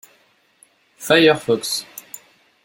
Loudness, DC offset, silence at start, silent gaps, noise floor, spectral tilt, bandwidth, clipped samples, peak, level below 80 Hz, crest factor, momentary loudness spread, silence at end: -17 LUFS; under 0.1%; 1 s; none; -59 dBFS; -3.5 dB/octave; 17 kHz; under 0.1%; -2 dBFS; -62 dBFS; 20 dB; 24 LU; 0.45 s